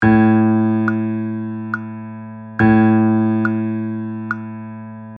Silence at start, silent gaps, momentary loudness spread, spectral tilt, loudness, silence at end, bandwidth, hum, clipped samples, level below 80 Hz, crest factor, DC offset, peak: 0 s; none; 18 LU; -10.5 dB/octave; -17 LUFS; 0 s; 4.6 kHz; none; under 0.1%; -48 dBFS; 14 dB; under 0.1%; -2 dBFS